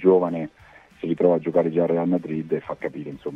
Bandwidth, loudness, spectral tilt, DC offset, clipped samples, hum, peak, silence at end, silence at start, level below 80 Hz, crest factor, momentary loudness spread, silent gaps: 5.2 kHz; -23 LUFS; -10 dB/octave; under 0.1%; under 0.1%; none; -4 dBFS; 0 s; 0 s; -62 dBFS; 18 dB; 12 LU; none